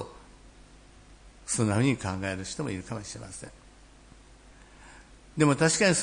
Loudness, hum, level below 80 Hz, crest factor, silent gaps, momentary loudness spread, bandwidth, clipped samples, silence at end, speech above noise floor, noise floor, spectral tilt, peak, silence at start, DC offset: -28 LUFS; 50 Hz at -55 dBFS; -54 dBFS; 20 dB; none; 21 LU; 10.5 kHz; under 0.1%; 0 s; 26 dB; -53 dBFS; -4.5 dB/octave; -10 dBFS; 0 s; under 0.1%